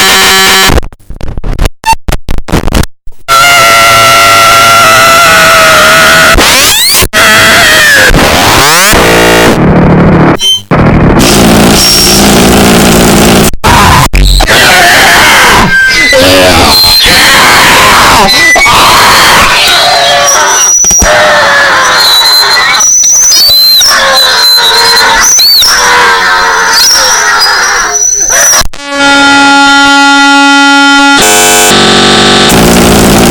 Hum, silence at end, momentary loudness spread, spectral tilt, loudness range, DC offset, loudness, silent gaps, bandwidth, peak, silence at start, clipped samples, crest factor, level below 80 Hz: none; 0 s; 4 LU; -2 dB/octave; 2 LU; under 0.1%; -1 LUFS; none; over 20 kHz; 0 dBFS; 0 s; 10%; 2 dB; -18 dBFS